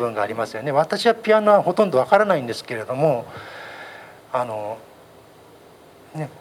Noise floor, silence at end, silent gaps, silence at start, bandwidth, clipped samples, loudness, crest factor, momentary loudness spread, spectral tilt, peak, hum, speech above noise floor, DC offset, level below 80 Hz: -47 dBFS; 0.1 s; none; 0 s; 15.5 kHz; under 0.1%; -20 LUFS; 22 dB; 20 LU; -5.5 dB/octave; 0 dBFS; none; 27 dB; under 0.1%; -68 dBFS